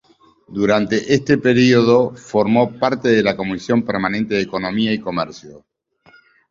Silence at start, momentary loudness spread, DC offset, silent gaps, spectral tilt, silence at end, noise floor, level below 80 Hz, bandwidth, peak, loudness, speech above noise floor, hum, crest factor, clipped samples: 0.5 s; 9 LU; under 0.1%; none; -6 dB/octave; 0.9 s; -52 dBFS; -52 dBFS; 7.6 kHz; -2 dBFS; -17 LUFS; 35 dB; none; 16 dB; under 0.1%